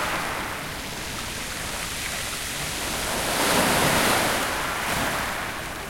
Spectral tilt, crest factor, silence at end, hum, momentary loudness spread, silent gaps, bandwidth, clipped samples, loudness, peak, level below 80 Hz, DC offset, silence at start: -2.5 dB/octave; 18 dB; 0 s; none; 11 LU; none; 16.5 kHz; under 0.1%; -24 LUFS; -8 dBFS; -44 dBFS; under 0.1%; 0 s